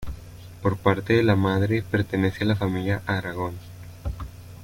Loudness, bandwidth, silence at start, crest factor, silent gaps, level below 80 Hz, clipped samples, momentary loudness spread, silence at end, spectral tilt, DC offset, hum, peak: -24 LUFS; 16.5 kHz; 0 s; 18 dB; none; -44 dBFS; under 0.1%; 19 LU; 0 s; -7.5 dB/octave; under 0.1%; none; -6 dBFS